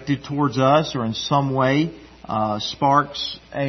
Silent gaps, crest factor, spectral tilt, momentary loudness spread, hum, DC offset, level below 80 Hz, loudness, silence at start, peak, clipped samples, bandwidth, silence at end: none; 16 dB; -6 dB/octave; 10 LU; none; under 0.1%; -52 dBFS; -21 LUFS; 0 s; -4 dBFS; under 0.1%; 6.4 kHz; 0 s